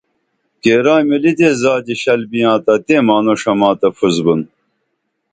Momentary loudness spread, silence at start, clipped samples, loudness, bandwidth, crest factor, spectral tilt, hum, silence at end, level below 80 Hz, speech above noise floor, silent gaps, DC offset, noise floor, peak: 5 LU; 0.65 s; under 0.1%; -13 LUFS; 9.2 kHz; 14 dB; -5.5 dB/octave; none; 0.85 s; -54 dBFS; 57 dB; none; under 0.1%; -70 dBFS; 0 dBFS